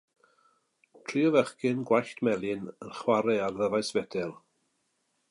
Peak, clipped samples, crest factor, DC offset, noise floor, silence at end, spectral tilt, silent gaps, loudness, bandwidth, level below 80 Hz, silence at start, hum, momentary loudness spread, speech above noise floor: -10 dBFS; under 0.1%; 20 dB; under 0.1%; -76 dBFS; 0.95 s; -5.5 dB/octave; none; -29 LUFS; 11.5 kHz; -70 dBFS; 1.1 s; none; 11 LU; 48 dB